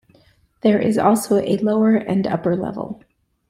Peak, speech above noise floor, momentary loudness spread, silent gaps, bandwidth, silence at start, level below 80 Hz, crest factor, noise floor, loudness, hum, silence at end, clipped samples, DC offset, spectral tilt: -2 dBFS; 38 dB; 12 LU; none; 16 kHz; 0.65 s; -56 dBFS; 16 dB; -56 dBFS; -18 LUFS; none; 0.55 s; under 0.1%; under 0.1%; -6.5 dB/octave